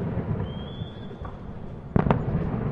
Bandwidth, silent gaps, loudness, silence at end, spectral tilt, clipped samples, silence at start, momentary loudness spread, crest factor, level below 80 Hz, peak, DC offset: 5 kHz; none; -29 LUFS; 0 s; -10 dB/octave; under 0.1%; 0 s; 15 LU; 26 dB; -40 dBFS; -2 dBFS; under 0.1%